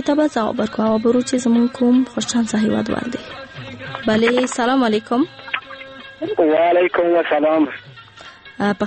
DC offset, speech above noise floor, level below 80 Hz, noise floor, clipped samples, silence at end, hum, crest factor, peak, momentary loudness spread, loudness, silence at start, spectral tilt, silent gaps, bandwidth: under 0.1%; 24 dB; -54 dBFS; -41 dBFS; under 0.1%; 0 s; none; 14 dB; -4 dBFS; 17 LU; -18 LUFS; 0 s; -5 dB/octave; none; 8.8 kHz